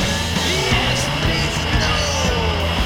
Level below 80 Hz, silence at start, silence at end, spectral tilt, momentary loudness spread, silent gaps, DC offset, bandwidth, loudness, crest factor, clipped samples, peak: -26 dBFS; 0 s; 0 s; -3.5 dB/octave; 2 LU; none; under 0.1%; 19 kHz; -18 LUFS; 14 dB; under 0.1%; -4 dBFS